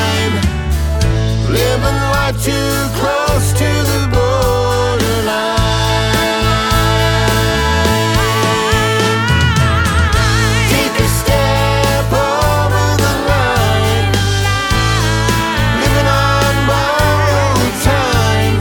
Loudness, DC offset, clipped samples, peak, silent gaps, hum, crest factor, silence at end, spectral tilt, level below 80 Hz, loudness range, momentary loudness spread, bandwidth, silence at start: -13 LUFS; under 0.1%; under 0.1%; 0 dBFS; none; none; 12 dB; 0 s; -4.5 dB/octave; -22 dBFS; 2 LU; 3 LU; 19.5 kHz; 0 s